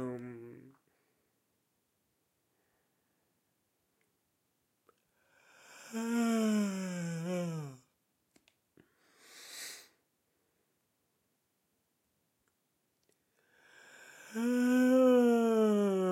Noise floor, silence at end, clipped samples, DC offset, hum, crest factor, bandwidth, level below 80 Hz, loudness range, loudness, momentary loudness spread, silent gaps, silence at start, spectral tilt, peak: -80 dBFS; 0 s; under 0.1%; under 0.1%; none; 20 dB; 16 kHz; under -90 dBFS; 22 LU; -30 LUFS; 23 LU; none; 0 s; -6 dB/octave; -16 dBFS